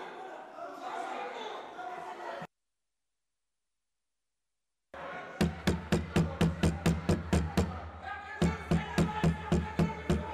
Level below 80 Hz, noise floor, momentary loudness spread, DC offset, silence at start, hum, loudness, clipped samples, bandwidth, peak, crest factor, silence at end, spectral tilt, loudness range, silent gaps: -44 dBFS; under -90 dBFS; 14 LU; under 0.1%; 0 s; none; -33 LUFS; under 0.1%; 15 kHz; -20 dBFS; 14 dB; 0 s; -6.5 dB/octave; 16 LU; none